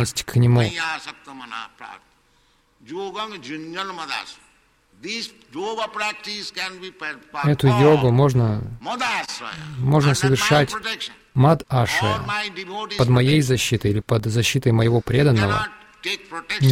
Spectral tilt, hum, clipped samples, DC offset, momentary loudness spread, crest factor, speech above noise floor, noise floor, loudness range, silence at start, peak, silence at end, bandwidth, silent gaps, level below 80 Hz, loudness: -5.5 dB/octave; none; under 0.1%; under 0.1%; 15 LU; 16 dB; 40 dB; -60 dBFS; 12 LU; 0 s; -4 dBFS; 0 s; 16 kHz; none; -48 dBFS; -21 LUFS